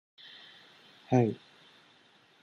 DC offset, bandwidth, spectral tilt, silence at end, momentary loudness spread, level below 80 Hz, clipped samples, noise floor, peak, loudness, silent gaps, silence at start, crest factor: under 0.1%; 6.6 kHz; -8 dB/octave; 1.1 s; 25 LU; -76 dBFS; under 0.1%; -63 dBFS; -12 dBFS; -29 LUFS; none; 1.1 s; 24 dB